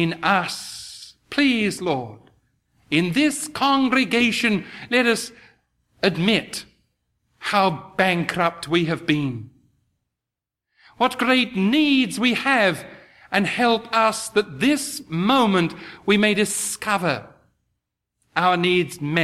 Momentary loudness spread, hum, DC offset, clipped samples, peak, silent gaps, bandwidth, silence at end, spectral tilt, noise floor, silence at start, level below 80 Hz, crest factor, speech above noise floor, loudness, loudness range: 11 LU; none; under 0.1%; under 0.1%; -2 dBFS; none; 15 kHz; 0 s; -4 dB/octave; -86 dBFS; 0 s; -60 dBFS; 20 dB; 66 dB; -20 LUFS; 4 LU